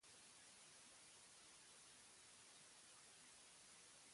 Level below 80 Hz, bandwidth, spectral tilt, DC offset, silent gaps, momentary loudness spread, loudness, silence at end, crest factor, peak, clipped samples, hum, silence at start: under -90 dBFS; 11.5 kHz; 0 dB/octave; under 0.1%; none; 0 LU; -63 LUFS; 0 s; 16 dB; -50 dBFS; under 0.1%; none; 0 s